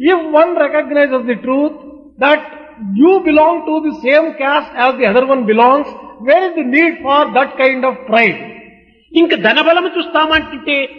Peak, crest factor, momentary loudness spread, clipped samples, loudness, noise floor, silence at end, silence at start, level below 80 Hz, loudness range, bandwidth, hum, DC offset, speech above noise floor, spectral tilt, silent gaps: 0 dBFS; 12 dB; 7 LU; under 0.1%; -12 LUFS; -43 dBFS; 0 s; 0 s; -50 dBFS; 1 LU; 6.2 kHz; none; under 0.1%; 31 dB; -6.5 dB/octave; none